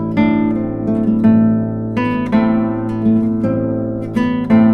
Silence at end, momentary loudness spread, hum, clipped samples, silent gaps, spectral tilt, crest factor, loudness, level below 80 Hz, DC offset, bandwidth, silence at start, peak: 0 s; 7 LU; none; under 0.1%; none; -9.5 dB/octave; 14 dB; -16 LUFS; -40 dBFS; under 0.1%; 5 kHz; 0 s; 0 dBFS